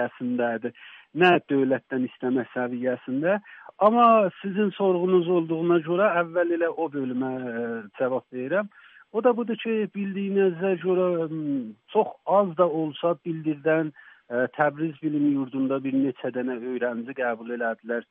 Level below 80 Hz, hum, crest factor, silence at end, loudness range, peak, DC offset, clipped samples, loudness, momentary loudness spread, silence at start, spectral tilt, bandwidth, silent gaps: -78 dBFS; none; 18 dB; 0.1 s; 5 LU; -6 dBFS; under 0.1%; under 0.1%; -25 LUFS; 9 LU; 0 s; -5 dB/octave; 4 kHz; none